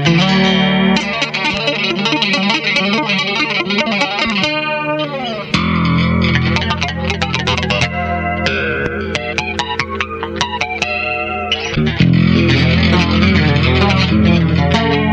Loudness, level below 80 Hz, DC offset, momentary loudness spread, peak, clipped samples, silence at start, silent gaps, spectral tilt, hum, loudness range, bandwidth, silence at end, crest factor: -14 LUFS; -30 dBFS; under 0.1%; 7 LU; 0 dBFS; under 0.1%; 0 s; none; -5.5 dB/octave; none; 5 LU; 8.6 kHz; 0 s; 14 dB